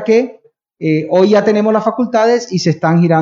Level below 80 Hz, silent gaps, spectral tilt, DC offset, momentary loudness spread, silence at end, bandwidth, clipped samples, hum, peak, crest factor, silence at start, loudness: -64 dBFS; none; -6.5 dB/octave; under 0.1%; 6 LU; 0 s; 7.6 kHz; under 0.1%; none; 0 dBFS; 12 dB; 0 s; -13 LUFS